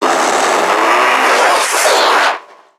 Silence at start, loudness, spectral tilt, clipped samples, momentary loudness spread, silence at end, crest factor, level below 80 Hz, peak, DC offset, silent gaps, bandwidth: 0 s; -11 LUFS; 0 dB/octave; under 0.1%; 3 LU; 0.35 s; 12 dB; -70 dBFS; 0 dBFS; under 0.1%; none; 19.5 kHz